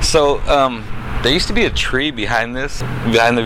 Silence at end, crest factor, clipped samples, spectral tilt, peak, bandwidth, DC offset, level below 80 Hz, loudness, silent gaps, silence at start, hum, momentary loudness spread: 0 s; 14 dB; under 0.1%; -4 dB/octave; -2 dBFS; 16 kHz; under 0.1%; -26 dBFS; -16 LUFS; none; 0 s; none; 9 LU